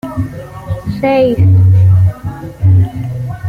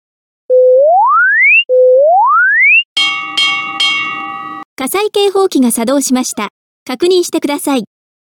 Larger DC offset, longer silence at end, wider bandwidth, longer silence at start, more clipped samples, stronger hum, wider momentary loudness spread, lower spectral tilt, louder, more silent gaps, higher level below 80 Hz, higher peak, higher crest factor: neither; second, 0 s vs 0.5 s; second, 4.7 kHz vs 19 kHz; second, 0.05 s vs 0.5 s; neither; neither; about the same, 15 LU vs 14 LU; first, -9.5 dB/octave vs -1.5 dB/octave; about the same, -12 LUFS vs -10 LUFS; second, none vs 2.85-2.96 s, 4.65-4.77 s, 6.50-6.86 s; first, -34 dBFS vs -64 dBFS; about the same, -2 dBFS vs -2 dBFS; about the same, 10 dB vs 10 dB